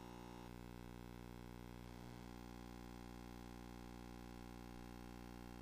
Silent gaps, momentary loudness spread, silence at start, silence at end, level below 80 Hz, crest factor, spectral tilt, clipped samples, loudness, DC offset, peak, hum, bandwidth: none; 0 LU; 0 s; 0 s; -62 dBFS; 12 dB; -6 dB/octave; under 0.1%; -56 LUFS; under 0.1%; -42 dBFS; 60 Hz at -55 dBFS; 15.5 kHz